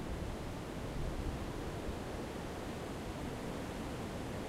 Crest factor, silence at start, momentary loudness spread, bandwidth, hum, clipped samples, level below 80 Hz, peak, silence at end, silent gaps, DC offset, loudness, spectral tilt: 14 dB; 0 s; 2 LU; 16 kHz; none; under 0.1%; -48 dBFS; -26 dBFS; 0 s; none; under 0.1%; -43 LUFS; -6 dB/octave